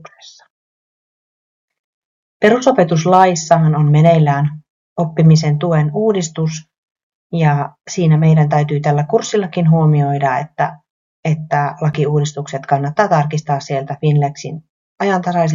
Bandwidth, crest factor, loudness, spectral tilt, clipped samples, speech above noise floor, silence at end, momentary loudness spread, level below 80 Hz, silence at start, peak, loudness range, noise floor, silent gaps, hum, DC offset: 7.4 kHz; 14 dB; -15 LUFS; -7 dB/octave; under 0.1%; 27 dB; 0 s; 10 LU; -52 dBFS; 0.25 s; 0 dBFS; 5 LU; -41 dBFS; 0.50-1.68 s, 1.79-2.40 s, 4.70-4.96 s, 6.78-6.95 s, 7.03-7.30 s, 10.90-11.23 s, 14.69-14.96 s; none; under 0.1%